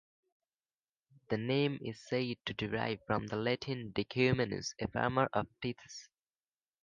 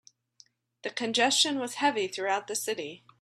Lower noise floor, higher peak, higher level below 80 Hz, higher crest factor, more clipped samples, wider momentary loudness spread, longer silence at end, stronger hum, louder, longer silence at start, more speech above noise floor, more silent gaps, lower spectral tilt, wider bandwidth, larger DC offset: first, under -90 dBFS vs -62 dBFS; second, -16 dBFS vs -10 dBFS; first, -62 dBFS vs -78 dBFS; about the same, 22 dB vs 20 dB; neither; second, 10 LU vs 14 LU; first, 0.8 s vs 0.25 s; neither; second, -35 LUFS vs -28 LUFS; first, 1.3 s vs 0.85 s; first, over 55 dB vs 33 dB; neither; first, -5.5 dB/octave vs -1 dB/octave; second, 9.2 kHz vs 15 kHz; neither